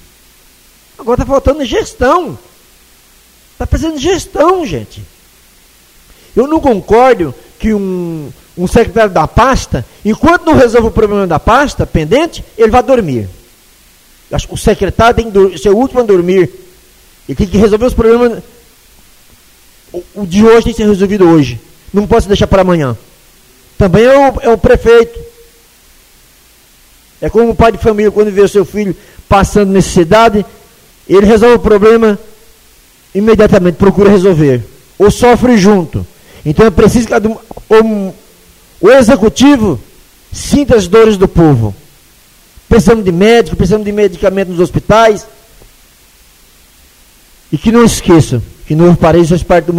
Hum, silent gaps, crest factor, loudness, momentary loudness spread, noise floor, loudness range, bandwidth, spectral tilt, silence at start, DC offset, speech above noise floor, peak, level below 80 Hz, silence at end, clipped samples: none; none; 10 dB; -9 LUFS; 13 LU; -43 dBFS; 6 LU; 16 kHz; -6 dB/octave; 1 s; under 0.1%; 35 dB; 0 dBFS; -26 dBFS; 0 s; 1%